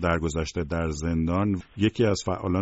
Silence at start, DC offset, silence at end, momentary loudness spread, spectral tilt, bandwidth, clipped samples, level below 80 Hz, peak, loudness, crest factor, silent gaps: 0 s; under 0.1%; 0 s; 5 LU; -6 dB/octave; 8 kHz; under 0.1%; -40 dBFS; -10 dBFS; -26 LUFS; 16 dB; none